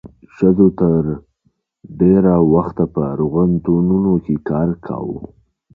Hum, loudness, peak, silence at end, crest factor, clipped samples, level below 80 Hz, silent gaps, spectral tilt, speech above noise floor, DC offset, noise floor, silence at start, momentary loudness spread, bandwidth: none; -16 LUFS; 0 dBFS; 0.5 s; 16 dB; under 0.1%; -40 dBFS; none; -13 dB/octave; 49 dB; under 0.1%; -64 dBFS; 0.05 s; 12 LU; 2.8 kHz